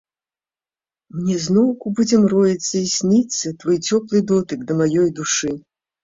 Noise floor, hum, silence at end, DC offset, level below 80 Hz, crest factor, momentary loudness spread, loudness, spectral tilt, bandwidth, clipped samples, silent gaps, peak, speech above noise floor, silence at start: under -90 dBFS; none; 0.45 s; under 0.1%; -58 dBFS; 16 dB; 7 LU; -18 LUFS; -5 dB/octave; 7.8 kHz; under 0.1%; none; -4 dBFS; over 72 dB; 1.15 s